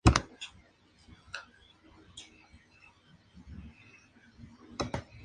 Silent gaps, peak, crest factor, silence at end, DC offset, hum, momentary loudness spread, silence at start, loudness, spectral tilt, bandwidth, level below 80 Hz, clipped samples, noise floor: none; -6 dBFS; 30 dB; 0.2 s; under 0.1%; none; 21 LU; 0.05 s; -38 LUFS; -5 dB/octave; 10.5 kHz; -42 dBFS; under 0.1%; -63 dBFS